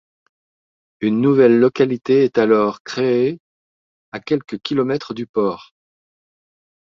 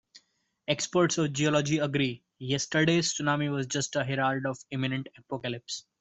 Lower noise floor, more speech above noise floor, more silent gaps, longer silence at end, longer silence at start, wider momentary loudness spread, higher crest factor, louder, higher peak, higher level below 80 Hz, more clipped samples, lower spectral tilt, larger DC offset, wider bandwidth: first, under -90 dBFS vs -68 dBFS; first, over 73 dB vs 39 dB; first, 2.80-2.85 s, 3.40-4.12 s, 5.29-5.34 s vs none; first, 1.2 s vs 0.2 s; first, 1 s vs 0.7 s; about the same, 11 LU vs 11 LU; about the same, 18 dB vs 18 dB; first, -17 LUFS vs -29 LUFS; first, -2 dBFS vs -12 dBFS; about the same, -62 dBFS vs -66 dBFS; neither; first, -7 dB/octave vs -4.5 dB/octave; neither; second, 7.2 kHz vs 8.2 kHz